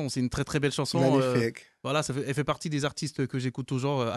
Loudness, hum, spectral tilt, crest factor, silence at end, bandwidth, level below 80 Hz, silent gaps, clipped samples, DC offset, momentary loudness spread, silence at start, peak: -28 LUFS; none; -5.5 dB/octave; 16 dB; 0 s; 12.5 kHz; -54 dBFS; none; under 0.1%; under 0.1%; 8 LU; 0 s; -12 dBFS